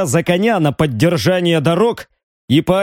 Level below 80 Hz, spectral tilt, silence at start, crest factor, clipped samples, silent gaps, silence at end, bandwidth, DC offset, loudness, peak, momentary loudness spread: -46 dBFS; -6 dB/octave; 0 s; 14 dB; under 0.1%; 2.23-2.48 s; 0 s; 17 kHz; under 0.1%; -15 LUFS; -2 dBFS; 3 LU